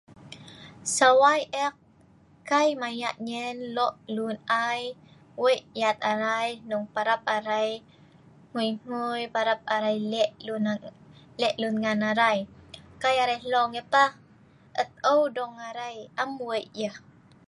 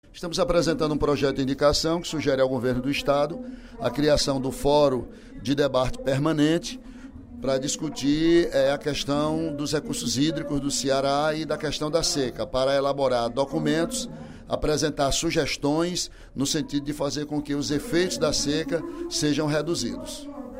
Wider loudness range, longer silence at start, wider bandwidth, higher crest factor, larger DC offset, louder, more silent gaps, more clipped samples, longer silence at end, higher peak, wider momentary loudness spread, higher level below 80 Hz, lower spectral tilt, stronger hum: about the same, 4 LU vs 2 LU; about the same, 0.2 s vs 0.15 s; second, 11.5 kHz vs 16 kHz; about the same, 22 dB vs 18 dB; neither; about the same, -26 LUFS vs -25 LUFS; neither; neither; first, 0.5 s vs 0 s; about the same, -6 dBFS vs -8 dBFS; first, 14 LU vs 9 LU; second, -68 dBFS vs -42 dBFS; second, -3 dB/octave vs -4.5 dB/octave; neither